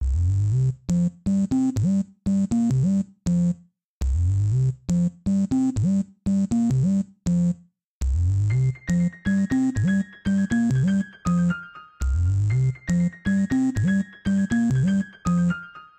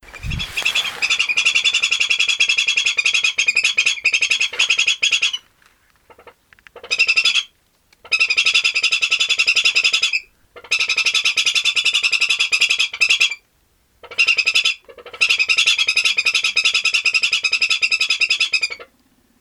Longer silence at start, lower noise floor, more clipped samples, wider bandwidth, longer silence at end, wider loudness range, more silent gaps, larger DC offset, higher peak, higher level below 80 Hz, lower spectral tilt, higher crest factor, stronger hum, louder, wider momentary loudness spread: about the same, 0 s vs 0.05 s; second, -43 dBFS vs -60 dBFS; neither; second, 9 kHz vs 18 kHz; second, 0.15 s vs 0.55 s; about the same, 1 LU vs 3 LU; first, 3.84-4.01 s, 7.84-8.01 s vs none; neither; second, -14 dBFS vs -2 dBFS; first, -34 dBFS vs -48 dBFS; first, -8 dB/octave vs 1.5 dB/octave; second, 8 dB vs 16 dB; neither; second, -23 LUFS vs -15 LUFS; second, 4 LU vs 7 LU